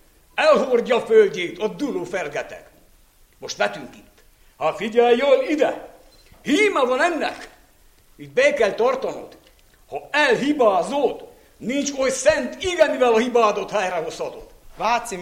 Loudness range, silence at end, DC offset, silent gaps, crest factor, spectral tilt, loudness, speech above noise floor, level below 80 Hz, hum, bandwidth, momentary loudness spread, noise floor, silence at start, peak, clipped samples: 4 LU; 0 s; under 0.1%; none; 18 dB; -3.5 dB/octave; -20 LUFS; 34 dB; -54 dBFS; none; 15.5 kHz; 15 LU; -54 dBFS; 0.35 s; -4 dBFS; under 0.1%